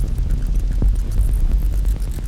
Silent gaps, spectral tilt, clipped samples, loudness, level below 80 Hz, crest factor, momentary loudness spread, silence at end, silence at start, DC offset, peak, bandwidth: none; -7 dB/octave; under 0.1%; -22 LUFS; -18 dBFS; 10 dB; 2 LU; 0 s; 0 s; under 0.1%; -6 dBFS; 13.5 kHz